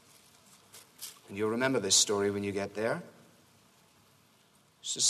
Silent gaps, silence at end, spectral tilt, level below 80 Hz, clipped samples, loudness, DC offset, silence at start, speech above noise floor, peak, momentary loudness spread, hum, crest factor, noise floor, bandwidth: none; 0 s; -2 dB/octave; -76 dBFS; under 0.1%; -30 LUFS; under 0.1%; 0.75 s; 35 dB; -10 dBFS; 20 LU; none; 22 dB; -65 dBFS; 13.5 kHz